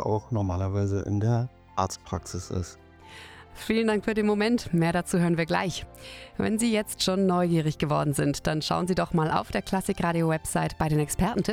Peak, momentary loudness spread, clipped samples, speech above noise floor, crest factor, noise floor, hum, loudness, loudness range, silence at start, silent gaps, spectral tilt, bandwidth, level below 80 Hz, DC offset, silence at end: -10 dBFS; 10 LU; under 0.1%; 21 dB; 18 dB; -47 dBFS; none; -27 LUFS; 4 LU; 0 s; none; -5.5 dB/octave; 16.5 kHz; -46 dBFS; under 0.1%; 0 s